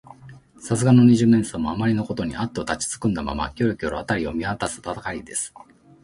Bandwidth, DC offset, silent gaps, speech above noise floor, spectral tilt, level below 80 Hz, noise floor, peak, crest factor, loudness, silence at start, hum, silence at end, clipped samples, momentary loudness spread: 11.5 kHz; under 0.1%; none; 23 dB; -6 dB/octave; -44 dBFS; -45 dBFS; -4 dBFS; 18 dB; -22 LUFS; 0.1 s; none; 0.55 s; under 0.1%; 13 LU